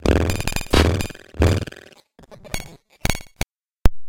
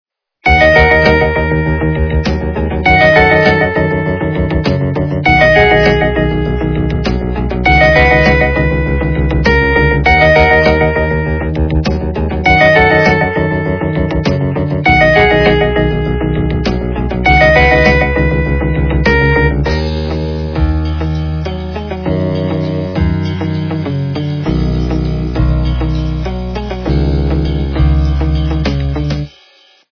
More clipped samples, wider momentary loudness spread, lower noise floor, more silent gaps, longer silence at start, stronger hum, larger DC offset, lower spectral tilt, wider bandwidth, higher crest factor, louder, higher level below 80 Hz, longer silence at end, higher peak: second, under 0.1% vs 0.3%; first, 14 LU vs 10 LU; about the same, -48 dBFS vs -46 dBFS; neither; second, 0 s vs 0.45 s; neither; second, under 0.1% vs 0.6%; second, -5 dB/octave vs -7.5 dB/octave; first, 17 kHz vs 5.4 kHz; first, 20 dB vs 12 dB; second, -23 LUFS vs -11 LUFS; second, -26 dBFS vs -18 dBFS; second, 0 s vs 0.65 s; about the same, 0 dBFS vs 0 dBFS